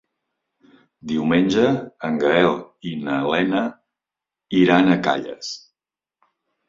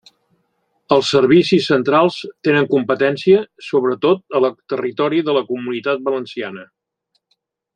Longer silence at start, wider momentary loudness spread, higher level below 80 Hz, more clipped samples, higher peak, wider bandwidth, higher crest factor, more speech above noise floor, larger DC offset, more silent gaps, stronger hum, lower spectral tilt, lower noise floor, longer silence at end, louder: first, 1.05 s vs 0.9 s; first, 15 LU vs 10 LU; about the same, -58 dBFS vs -62 dBFS; neither; about the same, -2 dBFS vs 0 dBFS; second, 7.6 kHz vs 9.4 kHz; about the same, 20 dB vs 16 dB; first, 70 dB vs 54 dB; neither; neither; neither; about the same, -6 dB/octave vs -6 dB/octave; first, -89 dBFS vs -70 dBFS; about the same, 1.1 s vs 1.1 s; second, -20 LUFS vs -17 LUFS